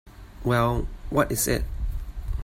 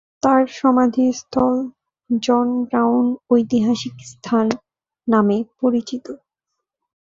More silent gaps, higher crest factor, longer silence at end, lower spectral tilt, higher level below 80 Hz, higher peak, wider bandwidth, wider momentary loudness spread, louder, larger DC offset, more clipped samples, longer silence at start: neither; about the same, 18 dB vs 16 dB; second, 0 s vs 0.85 s; about the same, -5 dB/octave vs -6 dB/octave; first, -32 dBFS vs -58 dBFS; second, -8 dBFS vs -2 dBFS; first, 16 kHz vs 7.6 kHz; second, 11 LU vs 14 LU; second, -26 LUFS vs -18 LUFS; neither; neither; second, 0.05 s vs 0.25 s